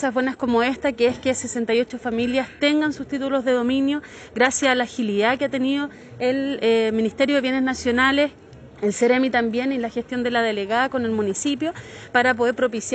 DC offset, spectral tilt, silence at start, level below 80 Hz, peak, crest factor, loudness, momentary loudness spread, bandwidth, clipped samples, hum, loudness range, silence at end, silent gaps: under 0.1%; -3.5 dB/octave; 0 s; -54 dBFS; -4 dBFS; 18 dB; -21 LUFS; 7 LU; 9.2 kHz; under 0.1%; none; 2 LU; 0 s; none